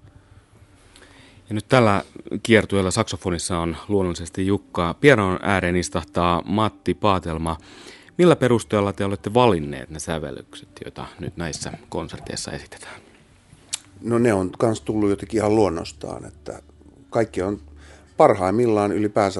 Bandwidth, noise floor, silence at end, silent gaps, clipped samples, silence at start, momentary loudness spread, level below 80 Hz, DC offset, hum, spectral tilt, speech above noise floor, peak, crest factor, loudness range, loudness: 11.5 kHz; -51 dBFS; 0 s; none; under 0.1%; 1.5 s; 18 LU; -50 dBFS; under 0.1%; none; -5.5 dB/octave; 30 dB; 0 dBFS; 22 dB; 9 LU; -21 LUFS